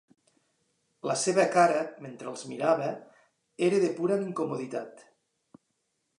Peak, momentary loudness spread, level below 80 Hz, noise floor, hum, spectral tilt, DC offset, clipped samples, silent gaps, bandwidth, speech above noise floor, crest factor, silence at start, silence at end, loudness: -10 dBFS; 16 LU; -84 dBFS; -78 dBFS; none; -4.5 dB/octave; under 0.1%; under 0.1%; none; 11 kHz; 51 dB; 20 dB; 1.05 s; 1.2 s; -28 LUFS